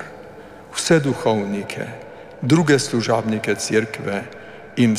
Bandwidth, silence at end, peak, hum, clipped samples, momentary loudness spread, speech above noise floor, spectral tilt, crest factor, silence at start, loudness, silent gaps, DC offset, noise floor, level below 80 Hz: 15.5 kHz; 0 s; -4 dBFS; none; under 0.1%; 20 LU; 20 dB; -5 dB/octave; 18 dB; 0 s; -20 LUFS; none; under 0.1%; -40 dBFS; -58 dBFS